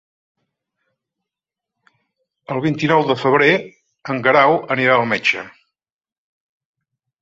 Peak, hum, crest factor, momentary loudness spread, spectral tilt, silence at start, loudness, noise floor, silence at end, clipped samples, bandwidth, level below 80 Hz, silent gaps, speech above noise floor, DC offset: -2 dBFS; none; 20 dB; 13 LU; -6 dB/octave; 2.5 s; -16 LUFS; -86 dBFS; 1.75 s; under 0.1%; 7.8 kHz; -62 dBFS; none; 70 dB; under 0.1%